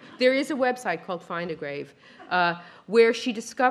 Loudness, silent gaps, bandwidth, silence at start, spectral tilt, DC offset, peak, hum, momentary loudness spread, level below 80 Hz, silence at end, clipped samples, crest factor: -25 LUFS; none; 12.5 kHz; 0.05 s; -4 dB/octave; under 0.1%; -6 dBFS; none; 14 LU; -74 dBFS; 0 s; under 0.1%; 20 dB